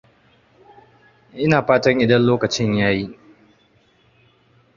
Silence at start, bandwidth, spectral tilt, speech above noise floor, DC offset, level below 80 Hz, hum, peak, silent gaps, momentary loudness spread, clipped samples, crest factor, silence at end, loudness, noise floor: 1.35 s; 7.4 kHz; -6 dB/octave; 41 dB; under 0.1%; -52 dBFS; none; 0 dBFS; none; 9 LU; under 0.1%; 20 dB; 1.65 s; -17 LUFS; -58 dBFS